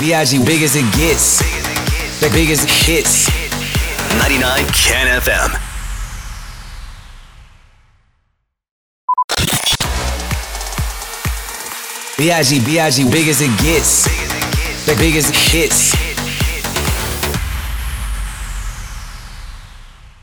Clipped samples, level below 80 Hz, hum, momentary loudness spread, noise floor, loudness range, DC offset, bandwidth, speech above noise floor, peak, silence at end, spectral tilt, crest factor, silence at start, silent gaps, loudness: under 0.1%; -24 dBFS; none; 17 LU; -66 dBFS; 10 LU; under 0.1%; over 20 kHz; 54 dB; -2 dBFS; 0.15 s; -3 dB/octave; 14 dB; 0 s; 8.71-9.08 s, 9.24-9.28 s; -14 LUFS